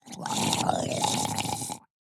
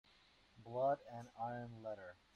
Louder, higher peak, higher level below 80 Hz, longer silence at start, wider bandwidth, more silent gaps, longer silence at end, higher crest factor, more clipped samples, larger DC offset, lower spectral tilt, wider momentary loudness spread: first, -28 LUFS vs -44 LUFS; first, -4 dBFS vs -28 dBFS; first, -64 dBFS vs -78 dBFS; second, 0.05 s vs 0.55 s; first, 19.5 kHz vs 9.8 kHz; neither; about the same, 0.3 s vs 0.2 s; first, 26 dB vs 18 dB; neither; neither; second, -3 dB/octave vs -7.5 dB/octave; second, 9 LU vs 14 LU